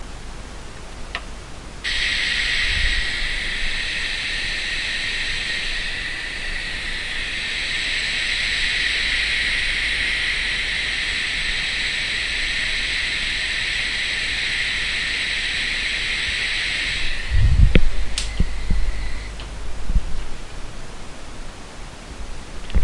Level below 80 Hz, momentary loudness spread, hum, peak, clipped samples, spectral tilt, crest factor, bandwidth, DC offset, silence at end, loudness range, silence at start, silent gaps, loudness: -28 dBFS; 18 LU; none; 0 dBFS; under 0.1%; -2.5 dB/octave; 20 dB; 11.5 kHz; under 0.1%; 0 s; 9 LU; 0 s; none; -21 LUFS